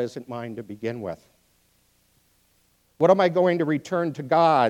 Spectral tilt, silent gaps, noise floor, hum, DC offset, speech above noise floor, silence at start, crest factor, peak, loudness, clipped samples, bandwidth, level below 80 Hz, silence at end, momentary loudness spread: -7 dB/octave; none; -65 dBFS; none; under 0.1%; 42 dB; 0 s; 20 dB; -4 dBFS; -23 LUFS; under 0.1%; 12.5 kHz; -70 dBFS; 0 s; 16 LU